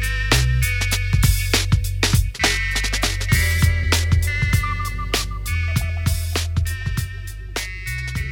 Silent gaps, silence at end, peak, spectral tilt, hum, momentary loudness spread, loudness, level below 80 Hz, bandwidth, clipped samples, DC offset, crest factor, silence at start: none; 0 s; -2 dBFS; -3.5 dB/octave; none; 9 LU; -20 LUFS; -24 dBFS; 18 kHz; under 0.1%; under 0.1%; 18 dB; 0 s